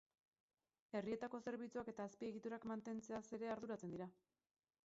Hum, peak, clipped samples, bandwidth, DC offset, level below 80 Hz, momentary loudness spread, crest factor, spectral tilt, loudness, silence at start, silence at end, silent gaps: none; -32 dBFS; under 0.1%; 7.6 kHz; under 0.1%; -82 dBFS; 4 LU; 18 dB; -6 dB/octave; -50 LUFS; 0.95 s; 0.7 s; none